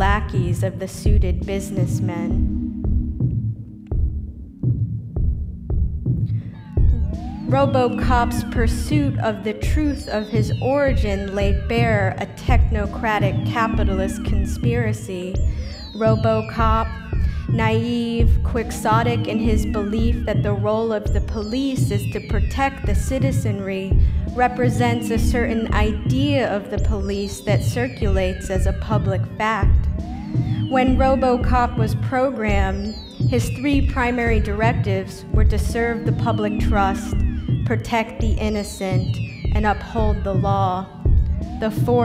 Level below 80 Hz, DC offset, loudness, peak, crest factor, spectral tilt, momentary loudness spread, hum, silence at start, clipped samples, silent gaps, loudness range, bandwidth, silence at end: -24 dBFS; under 0.1%; -21 LUFS; -4 dBFS; 16 dB; -7 dB/octave; 6 LU; none; 0 s; under 0.1%; none; 3 LU; 15.5 kHz; 0 s